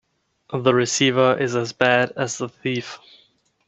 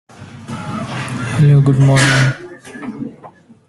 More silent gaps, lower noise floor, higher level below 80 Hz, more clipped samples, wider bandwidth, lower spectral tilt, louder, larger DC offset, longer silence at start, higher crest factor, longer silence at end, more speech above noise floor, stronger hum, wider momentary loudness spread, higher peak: neither; first, -60 dBFS vs -41 dBFS; second, -64 dBFS vs -46 dBFS; neither; second, 8.4 kHz vs 12 kHz; second, -4 dB/octave vs -5.5 dB/octave; second, -20 LUFS vs -13 LUFS; neither; first, 0.5 s vs 0.2 s; first, 22 dB vs 14 dB; first, 0.7 s vs 0.4 s; first, 40 dB vs 31 dB; neither; second, 12 LU vs 20 LU; about the same, 0 dBFS vs 0 dBFS